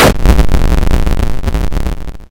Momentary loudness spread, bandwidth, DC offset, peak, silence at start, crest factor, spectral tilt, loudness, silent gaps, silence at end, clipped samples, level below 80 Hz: 9 LU; 17 kHz; under 0.1%; 0 dBFS; 0 s; 8 dB; -5.5 dB/octave; -14 LUFS; none; 0.1 s; under 0.1%; -12 dBFS